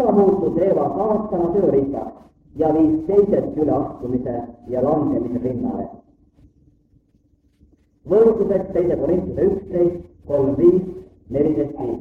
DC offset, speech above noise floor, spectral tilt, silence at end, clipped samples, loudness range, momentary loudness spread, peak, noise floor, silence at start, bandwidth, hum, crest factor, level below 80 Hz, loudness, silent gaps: under 0.1%; 41 dB; -11 dB/octave; 0 s; under 0.1%; 7 LU; 12 LU; -2 dBFS; -59 dBFS; 0 s; 3.5 kHz; none; 16 dB; -46 dBFS; -19 LUFS; none